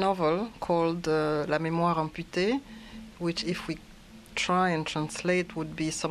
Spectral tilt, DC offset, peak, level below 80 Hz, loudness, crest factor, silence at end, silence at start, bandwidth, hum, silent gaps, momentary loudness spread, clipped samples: -5 dB/octave; under 0.1%; -12 dBFS; -54 dBFS; -29 LUFS; 18 dB; 0 s; 0 s; 13.5 kHz; none; none; 10 LU; under 0.1%